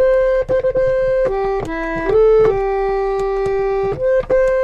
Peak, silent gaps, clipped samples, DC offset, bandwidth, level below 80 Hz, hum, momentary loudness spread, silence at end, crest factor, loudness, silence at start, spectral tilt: -6 dBFS; none; under 0.1%; under 0.1%; 7.8 kHz; -32 dBFS; none; 7 LU; 0 s; 10 dB; -16 LUFS; 0 s; -7 dB/octave